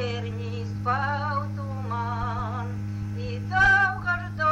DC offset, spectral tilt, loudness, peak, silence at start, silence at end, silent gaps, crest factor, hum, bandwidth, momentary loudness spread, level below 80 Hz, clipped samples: under 0.1%; -6 dB/octave; -26 LUFS; -10 dBFS; 0 s; 0 s; none; 16 dB; none; 8.2 kHz; 13 LU; -44 dBFS; under 0.1%